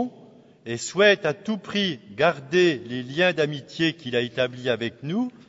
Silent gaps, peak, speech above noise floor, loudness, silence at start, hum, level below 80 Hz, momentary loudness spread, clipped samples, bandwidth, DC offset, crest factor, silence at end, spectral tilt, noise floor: none; -6 dBFS; 26 dB; -24 LUFS; 0 s; none; -66 dBFS; 11 LU; under 0.1%; 8 kHz; under 0.1%; 18 dB; 0.2 s; -4.5 dB/octave; -50 dBFS